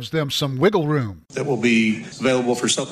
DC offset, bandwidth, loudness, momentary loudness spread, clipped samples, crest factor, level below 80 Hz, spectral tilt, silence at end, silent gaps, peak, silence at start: under 0.1%; 15 kHz; -20 LUFS; 7 LU; under 0.1%; 16 dB; -58 dBFS; -4.5 dB/octave; 0 s; none; -4 dBFS; 0 s